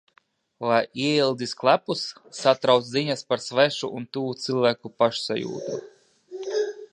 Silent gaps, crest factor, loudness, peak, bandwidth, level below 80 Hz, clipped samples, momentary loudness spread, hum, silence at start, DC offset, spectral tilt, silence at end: none; 22 dB; -24 LUFS; -2 dBFS; 11 kHz; -74 dBFS; under 0.1%; 10 LU; none; 0.6 s; under 0.1%; -4.5 dB/octave; 0.05 s